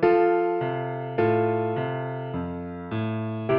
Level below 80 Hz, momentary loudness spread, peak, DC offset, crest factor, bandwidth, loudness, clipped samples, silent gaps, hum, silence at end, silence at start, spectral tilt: -58 dBFS; 10 LU; -8 dBFS; under 0.1%; 16 dB; 5.4 kHz; -26 LUFS; under 0.1%; none; none; 0 s; 0 s; -10.5 dB/octave